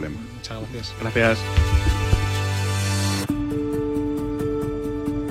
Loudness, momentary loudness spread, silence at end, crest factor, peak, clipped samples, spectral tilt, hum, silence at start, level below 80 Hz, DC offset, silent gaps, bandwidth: -24 LUFS; 12 LU; 0 s; 20 dB; -4 dBFS; under 0.1%; -5.5 dB/octave; none; 0 s; -30 dBFS; under 0.1%; none; 15.5 kHz